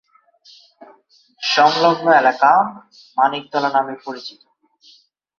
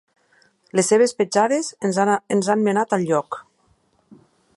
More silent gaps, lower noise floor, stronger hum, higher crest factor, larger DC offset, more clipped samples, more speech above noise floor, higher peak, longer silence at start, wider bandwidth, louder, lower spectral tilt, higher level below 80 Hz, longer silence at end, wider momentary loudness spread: neither; second, -54 dBFS vs -62 dBFS; neither; about the same, 18 dB vs 18 dB; neither; neither; second, 38 dB vs 43 dB; first, 0 dBFS vs -4 dBFS; first, 1.4 s vs 0.75 s; second, 7.2 kHz vs 11.5 kHz; first, -16 LUFS vs -20 LUFS; about the same, -4 dB/octave vs -4.5 dB/octave; about the same, -70 dBFS vs -70 dBFS; about the same, 1.1 s vs 1.15 s; first, 17 LU vs 6 LU